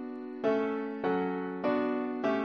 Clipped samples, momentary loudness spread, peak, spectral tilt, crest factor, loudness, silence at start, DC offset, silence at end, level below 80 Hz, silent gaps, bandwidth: under 0.1%; 4 LU; -18 dBFS; -8 dB/octave; 14 dB; -32 LUFS; 0 s; under 0.1%; 0 s; -74 dBFS; none; 6.4 kHz